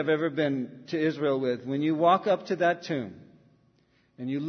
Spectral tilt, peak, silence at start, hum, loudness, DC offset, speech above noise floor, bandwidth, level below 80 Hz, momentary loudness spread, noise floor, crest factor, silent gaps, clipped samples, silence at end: -7 dB/octave; -10 dBFS; 0 s; none; -27 LUFS; under 0.1%; 39 dB; 6.4 kHz; -76 dBFS; 11 LU; -66 dBFS; 18 dB; none; under 0.1%; 0 s